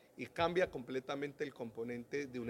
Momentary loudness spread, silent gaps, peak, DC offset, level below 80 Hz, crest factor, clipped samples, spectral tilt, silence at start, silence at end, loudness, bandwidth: 10 LU; none; -20 dBFS; under 0.1%; -70 dBFS; 20 dB; under 0.1%; -5.5 dB/octave; 0.15 s; 0 s; -40 LUFS; 16.5 kHz